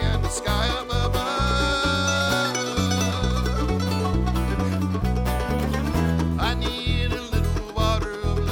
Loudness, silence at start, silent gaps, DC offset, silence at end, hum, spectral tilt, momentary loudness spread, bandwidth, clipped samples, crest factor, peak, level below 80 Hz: -24 LUFS; 0 s; none; under 0.1%; 0 s; none; -5 dB/octave; 4 LU; over 20 kHz; under 0.1%; 14 dB; -8 dBFS; -28 dBFS